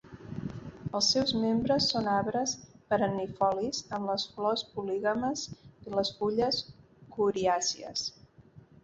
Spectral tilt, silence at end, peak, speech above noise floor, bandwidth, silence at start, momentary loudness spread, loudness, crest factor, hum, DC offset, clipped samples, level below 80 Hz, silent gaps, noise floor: -3.5 dB/octave; 0.25 s; -14 dBFS; 26 dB; 8.2 kHz; 0.1 s; 14 LU; -30 LUFS; 18 dB; none; under 0.1%; under 0.1%; -60 dBFS; none; -56 dBFS